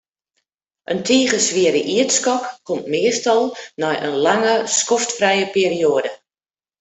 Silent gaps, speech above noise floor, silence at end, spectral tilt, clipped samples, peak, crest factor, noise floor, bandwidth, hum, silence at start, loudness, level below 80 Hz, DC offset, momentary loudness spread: none; over 72 dB; 0.65 s; -2.5 dB/octave; under 0.1%; -2 dBFS; 16 dB; under -90 dBFS; 8.4 kHz; none; 0.9 s; -18 LUFS; -64 dBFS; under 0.1%; 9 LU